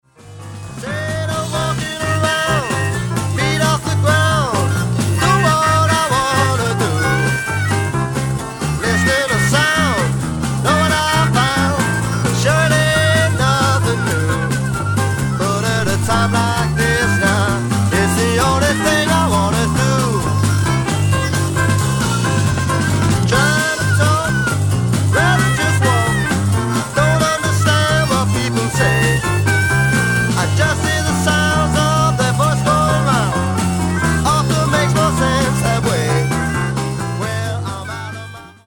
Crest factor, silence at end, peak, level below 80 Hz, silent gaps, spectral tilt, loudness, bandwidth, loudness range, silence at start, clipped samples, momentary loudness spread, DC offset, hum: 14 dB; 0.15 s; 0 dBFS; -34 dBFS; none; -4.5 dB/octave; -15 LUFS; 17.5 kHz; 2 LU; 0.25 s; under 0.1%; 6 LU; under 0.1%; none